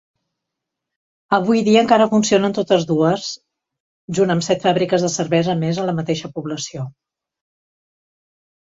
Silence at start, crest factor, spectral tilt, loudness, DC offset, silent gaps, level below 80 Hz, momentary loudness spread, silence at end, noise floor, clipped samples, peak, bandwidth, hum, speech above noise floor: 1.3 s; 18 dB; -5 dB/octave; -18 LUFS; under 0.1%; 3.80-4.08 s; -58 dBFS; 13 LU; 1.75 s; -81 dBFS; under 0.1%; -2 dBFS; 8 kHz; none; 64 dB